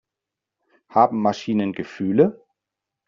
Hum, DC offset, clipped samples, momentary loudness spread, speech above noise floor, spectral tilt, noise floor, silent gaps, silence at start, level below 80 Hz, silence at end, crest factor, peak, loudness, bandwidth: none; under 0.1%; under 0.1%; 7 LU; 66 dB; -6.5 dB/octave; -86 dBFS; none; 0.95 s; -64 dBFS; 0.75 s; 20 dB; -4 dBFS; -21 LUFS; 7.4 kHz